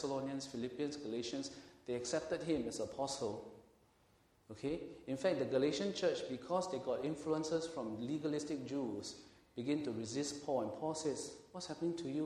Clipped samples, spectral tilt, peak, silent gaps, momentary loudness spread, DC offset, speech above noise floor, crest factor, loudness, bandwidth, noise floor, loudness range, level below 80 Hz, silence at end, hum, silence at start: under 0.1%; -4.5 dB/octave; -22 dBFS; none; 10 LU; under 0.1%; 31 dB; 18 dB; -40 LUFS; 12.5 kHz; -71 dBFS; 4 LU; -72 dBFS; 0 s; none; 0 s